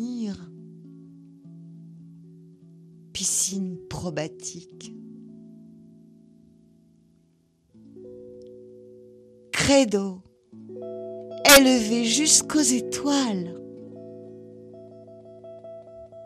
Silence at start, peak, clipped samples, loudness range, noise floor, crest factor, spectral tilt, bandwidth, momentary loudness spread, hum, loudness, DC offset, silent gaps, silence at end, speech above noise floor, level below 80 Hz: 0 s; 0 dBFS; under 0.1%; 18 LU; -64 dBFS; 26 dB; -2.5 dB/octave; 13.5 kHz; 28 LU; none; -21 LUFS; under 0.1%; none; 0 s; 41 dB; -56 dBFS